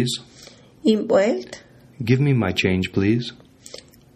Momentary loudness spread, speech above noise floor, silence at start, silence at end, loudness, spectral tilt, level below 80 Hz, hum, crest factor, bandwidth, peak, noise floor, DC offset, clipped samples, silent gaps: 22 LU; 27 dB; 0 s; 0.4 s; -21 LUFS; -6 dB/octave; -56 dBFS; none; 18 dB; 14 kHz; -4 dBFS; -46 dBFS; under 0.1%; under 0.1%; none